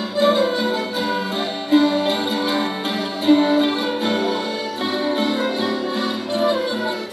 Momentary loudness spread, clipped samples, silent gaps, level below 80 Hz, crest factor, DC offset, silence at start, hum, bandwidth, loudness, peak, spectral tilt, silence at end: 7 LU; under 0.1%; none; -70 dBFS; 18 dB; under 0.1%; 0 s; none; 13.5 kHz; -20 LUFS; -2 dBFS; -4.5 dB/octave; 0 s